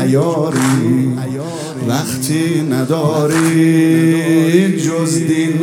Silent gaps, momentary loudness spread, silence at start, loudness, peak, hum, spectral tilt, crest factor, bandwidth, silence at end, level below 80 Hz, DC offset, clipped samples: none; 7 LU; 0 s; -14 LUFS; 0 dBFS; none; -6 dB/octave; 14 dB; 17 kHz; 0 s; -60 dBFS; under 0.1%; under 0.1%